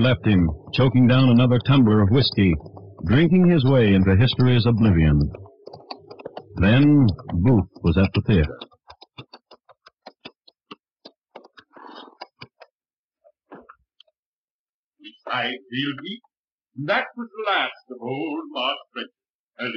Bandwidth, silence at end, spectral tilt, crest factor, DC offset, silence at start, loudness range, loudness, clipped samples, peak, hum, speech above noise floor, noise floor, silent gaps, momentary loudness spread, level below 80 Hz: 5.6 kHz; 0 s; -9.5 dB/octave; 12 dB; under 0.1%; 0 s; 14 LU; -19 LUFS; under 0.1%; -8 dBFS; none; over 72 dB; under -90 dBFS; 10.92-10.96 s, 11.17-11.21 s, 12.71-12.78 s, 12.93-13.09 s, 14.19-14.93 s, 16.37-16.58 s, 19.30-19.48 s; 22 LU; -40 dBFS